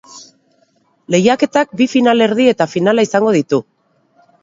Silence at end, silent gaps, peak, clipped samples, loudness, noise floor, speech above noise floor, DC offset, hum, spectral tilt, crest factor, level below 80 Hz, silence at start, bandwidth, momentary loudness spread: 0.8 s; none; 0 dBFS; under 0.1%; -13 LUFS; -58 dBFS; 45 dB; under 0.1%; none; -5.5 dB/octave; 14 dB; -60 dBFS; 0.15 s; 7.8 kHz; 4 LU